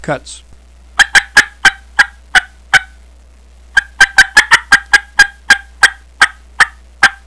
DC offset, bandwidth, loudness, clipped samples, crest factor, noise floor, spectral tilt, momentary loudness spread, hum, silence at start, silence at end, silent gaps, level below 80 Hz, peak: 0.4%; 11 kHz; -10 LUFS; 2%; 12 dB; -41 dBFS; 0 dB/octave; 6 LU; none; 0 s; 0.15 s; none; -36 dBFS; 0 dBFS